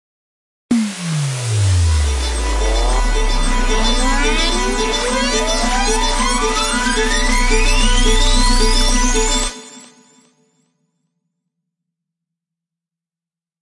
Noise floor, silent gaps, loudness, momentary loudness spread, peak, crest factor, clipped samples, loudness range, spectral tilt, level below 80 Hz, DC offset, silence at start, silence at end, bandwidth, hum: -90 dBFS; none; -16 LUFS; 5 LU; -2 dBFS; 14 dB; under 0.1%; 4 LU; -3.5 dB/octave; -18 dBFS; under 0.1%; 0.7 s; 3.8 s; 11.5 kHz; none